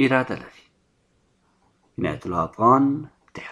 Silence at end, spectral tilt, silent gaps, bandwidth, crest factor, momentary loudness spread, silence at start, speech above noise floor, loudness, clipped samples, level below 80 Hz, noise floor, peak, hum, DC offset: 0 s; -7.5 dB/octave; none; 10.5 kHz; 20 dB; 22 LU; 0 s; 44 dB; -22 LUFS; under 0.1%; -58 dBFS; -65 dBFS; -4 dBFS; none; under 0.1%